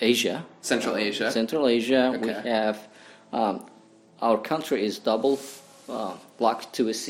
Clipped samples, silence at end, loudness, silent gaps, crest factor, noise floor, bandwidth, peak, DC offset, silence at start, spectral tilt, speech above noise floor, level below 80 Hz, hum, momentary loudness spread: under 0.1%; 0 s; -26 LUFS; none; 20 dB; -53 dBFS; 16.5 kHz; -6 dBFS; under 0.1%; 0 s; -3.5 dB/octave; 27 dB; -70 dBFS; none; 11 LU